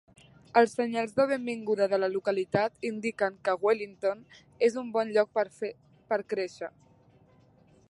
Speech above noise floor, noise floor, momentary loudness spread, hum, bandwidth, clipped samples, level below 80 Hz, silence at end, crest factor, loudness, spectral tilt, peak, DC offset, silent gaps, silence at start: 32 dB; -61 dBFS; 8 LU; none; 11.5 kHz; under 0.1%; -72 dBFS; 1.2 s; 22 dB; -29 LUFS; -5.5 dB/octave; -8 dBFS; under 0.1%; none; 0.55 s